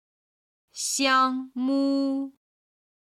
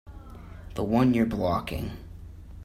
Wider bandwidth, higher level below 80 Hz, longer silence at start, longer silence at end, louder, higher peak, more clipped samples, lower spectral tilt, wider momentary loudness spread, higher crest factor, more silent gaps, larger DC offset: about the same, 14.5 kHz vs 15.5 kHz; second, -74 dBFS vs -44 dBFS; first, 0.75 s vs 0.05 s; first, 0.8 s vs 0 s; about the same, -25 LUFS vs -26 LUFS; about the same, -10 dBFS vs -10 dBFS; neither; second, -1 dB/octave vs -8 dB/octave; second, 13 LU vs 23 LU; about the same, 18 dB vs 18 dB; neither; neither